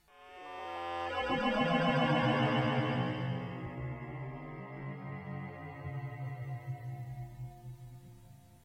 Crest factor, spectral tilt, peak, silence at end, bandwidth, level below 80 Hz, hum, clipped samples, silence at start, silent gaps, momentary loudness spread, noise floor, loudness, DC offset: 18 dB; -7 dB/octave; -18 dBFS; 0.1 s; 9.2 kHz; -60 dBFS; none; under 0.1%; 0.15 s; none; 18 LU; -57 dBFS; -35 LUFS; under 0.1%